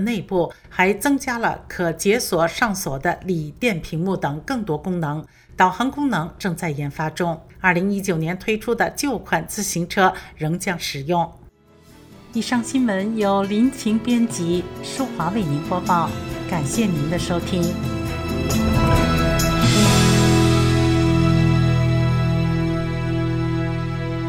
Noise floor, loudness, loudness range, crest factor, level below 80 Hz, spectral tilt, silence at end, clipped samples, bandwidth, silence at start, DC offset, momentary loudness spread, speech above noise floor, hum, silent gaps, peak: -49 dBFS; -20 LUFS; 6 LU; 18 dB; -36 dBFS; -5.5 dB/octave; 0 s; under 0.1%; 19.5 kHz; 0 s; under 0.1%; 9 LU; 28 dB; none; none; -2 dBFS